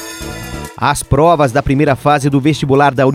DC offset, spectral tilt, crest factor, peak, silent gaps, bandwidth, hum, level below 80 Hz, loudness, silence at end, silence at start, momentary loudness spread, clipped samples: under 0.1%; -6 dB/octave; 12 dB; 0 dBFS; none; 16 kHz; none; -32 dBFS; -12 LUFS; 0 s; 0 s; 15 LU; under 0.1%